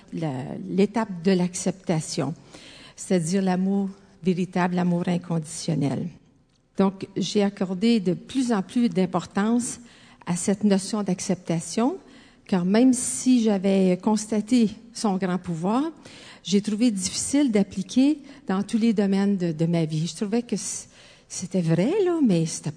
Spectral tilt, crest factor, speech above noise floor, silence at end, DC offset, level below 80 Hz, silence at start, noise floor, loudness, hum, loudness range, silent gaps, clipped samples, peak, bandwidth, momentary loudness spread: -5.5 dB/octave; 16 dB; 37 dB; 0 s; under 0.1%; -62 dBFS; 0.1 s; -61 dBFS; -24 LUFS; none; 4 LU; none; under 0.1%; -8 dBFS; 10 kHz; 10 LU